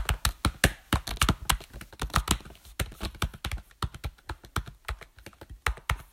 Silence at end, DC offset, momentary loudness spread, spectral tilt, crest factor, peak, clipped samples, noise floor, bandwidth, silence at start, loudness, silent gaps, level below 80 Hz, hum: 0.05 s; under 0.1%; 15 LU; -3.5 dB/octave; 28 dB; -4 dBFS; under 0.1%; -49 dBFS; 16.5 kHz; 0 s; -31 LUFS; none; -36 dBFS; none